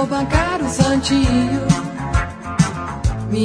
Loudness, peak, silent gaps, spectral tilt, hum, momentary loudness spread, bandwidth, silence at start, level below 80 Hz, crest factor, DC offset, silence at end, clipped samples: -18 LUFS; 0 dBFS; none; -5.5 dB/octave; none; 7 LU; 10.5 kHz; 0 s; -28 dBFS; 18 dB; under 0.1%; 0 s; under 0.1%